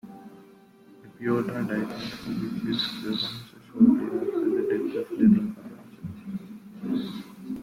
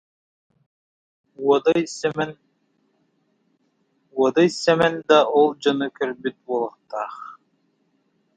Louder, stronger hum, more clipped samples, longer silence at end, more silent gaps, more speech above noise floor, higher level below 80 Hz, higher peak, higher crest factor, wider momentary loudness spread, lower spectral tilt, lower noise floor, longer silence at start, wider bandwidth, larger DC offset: second, -27 LUFS vs -21 LUFS; neither; neither; second, 0 s vs 1.05 s; neither; second, 28 dB vs 47 dB; about the same, -62 dBFS vs -66 dBFS; second, -8 dBFS vs -2 dBFS; about the same, 20 dB vs 20 dB; first, 20 LU vs 14 LU; first, -7 dB/octave vs -5 dB/octave; second, -53 dBFS vs -67 dBFS; second, 0.05 s vs 1.4 s; first, 15.5 kHz vs 9.2 kHz; neither